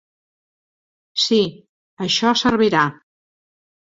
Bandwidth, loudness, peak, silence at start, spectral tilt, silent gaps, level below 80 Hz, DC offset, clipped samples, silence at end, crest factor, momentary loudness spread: 7.8 kHz; -18 LUFS; -2 dBFS; 1.15 s; -4 dB/octave; 1.69-1.97 s; -54 dBFS; under 0.1%; under 0.1%; 0.95 s; 20 dB; 9 LU